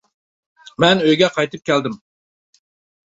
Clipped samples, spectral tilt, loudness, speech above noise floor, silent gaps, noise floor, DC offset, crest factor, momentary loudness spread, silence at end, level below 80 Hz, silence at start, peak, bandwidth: under 0.1%; -5 dB/octave; -17 LUFS; over 74 dB; none; under -90 dBFS; under 0.1%; 18 dB; 19 LU; 1.1 s; -60 dBFS; 0.8 s; 0 dBFS; 8 kHz